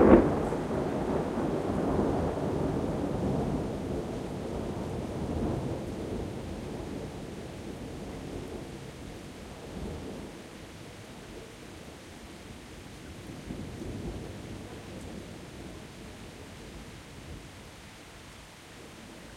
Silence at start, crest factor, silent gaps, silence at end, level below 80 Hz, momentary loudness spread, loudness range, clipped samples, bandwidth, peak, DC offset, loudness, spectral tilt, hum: 0 s; 28 dB; none; 0 s; -46 dBFS; 15 LU; 14 LU; under 0.1%; 16 kHz; -4 dBFS; under 0.1%; -34 LUFS; -7 dB/octave; none